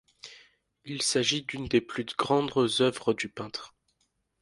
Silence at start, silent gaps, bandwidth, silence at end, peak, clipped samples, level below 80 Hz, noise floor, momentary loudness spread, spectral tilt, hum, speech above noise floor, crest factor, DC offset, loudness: 0.25 s; none; 11.5 kHz; 0.75 s; -10 dBFS; under 0.1%; -62 dBFS; -75 dBFS; 15 LU; -3.5 dB/octave; none; 47 dB; 20 dB; under 0.1%; -28 LUFS